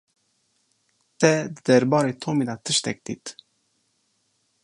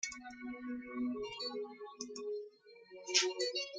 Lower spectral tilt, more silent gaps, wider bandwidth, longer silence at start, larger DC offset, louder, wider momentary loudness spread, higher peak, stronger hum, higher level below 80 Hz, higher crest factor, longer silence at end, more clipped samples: first, -4.5 dB/octave vs -0.5 dB/octave; neither; about the same, 11.5 kHz vs 11 kHz; first, 1.2 s vs 0 s; neither; first, -22 LUFS vs -39 LUFS; about the same, 15 LU vs 16 LU; first, -2 dBFS vs -14 dBFS; neither; first, -68 dBFS vs -76 dBFS; about the same, 22 dB vs 26 dB; first, 1.35 s vs 0 s; neither